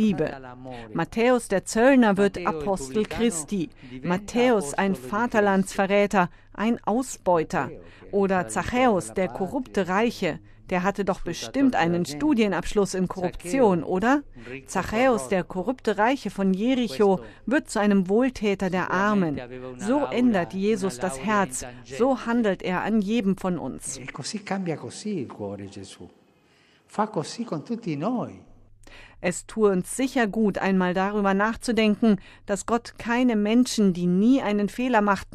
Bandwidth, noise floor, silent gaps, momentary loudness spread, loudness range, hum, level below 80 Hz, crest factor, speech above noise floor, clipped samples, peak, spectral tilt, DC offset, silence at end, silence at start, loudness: 14 kHz; -60 dBFS; none; 10 LU; 8 LU; none; -48 dBFS; 18 dB; 36 dB; under 0.1%; -6 dBFS; -5.5 dB/octave; under 0.1%; 0 s; 0 s; -24 LUFS